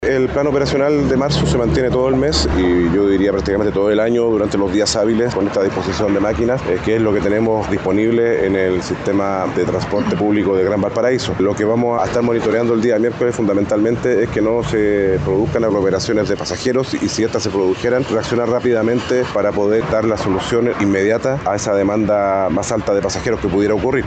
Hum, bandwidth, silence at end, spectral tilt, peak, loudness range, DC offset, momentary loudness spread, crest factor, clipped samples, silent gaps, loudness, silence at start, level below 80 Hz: none; 9 kHz; 0 s; -6 dB/octave; -4 dBFS; 2 LU; under 0.1%; 3 LU; 12 dB; under 0.1%; none; -16 LUFS; 0 s; -34 dBFS